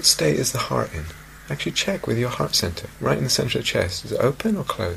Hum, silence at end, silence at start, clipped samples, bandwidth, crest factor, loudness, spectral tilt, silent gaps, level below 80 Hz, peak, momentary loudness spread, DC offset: none; 0 s; 0 s; under 0.1%; 15.5 kHz; 20 dB; -22 LUFS; -3.5 dB/octave; none; -44 dBFS; -2 dBFS; 9 LU; under 0.1%